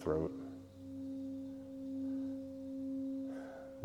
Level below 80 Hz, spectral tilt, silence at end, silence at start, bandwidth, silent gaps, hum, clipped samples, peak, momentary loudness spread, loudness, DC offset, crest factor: -64 dBFS; -8.5 dB/octave; 0 s; 0 s; 9.4 kHz; none; none; under 0.1%; -22 dBFS; 9 LU; -44 LUFS; under 0.1%; 20 dB